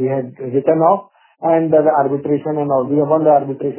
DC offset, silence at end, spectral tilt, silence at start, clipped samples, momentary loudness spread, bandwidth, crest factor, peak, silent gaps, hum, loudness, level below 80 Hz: under 0.1%; 0 s; -12.5 dB/octave; 0 s; under 0.1%; 7 LU; 3.2 kHz; 14 dB; 0 dBFS; none; none; -16 LUFS; -64 dBFS